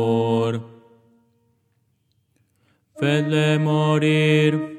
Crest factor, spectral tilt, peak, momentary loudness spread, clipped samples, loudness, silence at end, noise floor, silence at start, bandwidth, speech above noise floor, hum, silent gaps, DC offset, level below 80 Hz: 16 dB; -7 dB/octave; -6 dBFS; 8 LU; under 0.1%; -20 LUFS; 0 s; -67 dBFS; 0 s; 9.6 kHz; 48 dB; none; none; under 0.1%; -74 dBFS